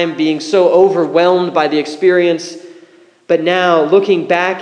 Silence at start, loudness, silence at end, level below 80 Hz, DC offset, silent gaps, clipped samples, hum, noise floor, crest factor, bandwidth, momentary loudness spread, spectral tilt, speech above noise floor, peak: 0 s; -12 LUFS; 0 s; -66 dBFS; under 0.1%; none; under 0.1%; none; -45 dBFS; 12 dB; 9.8 kHz; 6 LU; -5.5 dB/octave; 33 dB; 0 dBFS